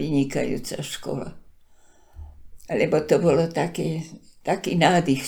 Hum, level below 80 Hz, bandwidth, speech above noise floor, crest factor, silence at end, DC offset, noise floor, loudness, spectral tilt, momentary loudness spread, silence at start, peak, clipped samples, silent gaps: none; -50 dBFS; 19.5 kHz; 29 dB; 20 dB; 0 s; under 0.1%; -52 dBFS; -23 LUFS; -5.5 dB/octave; 14 LU; 0 s; -4 dBFS; under 0.1%; none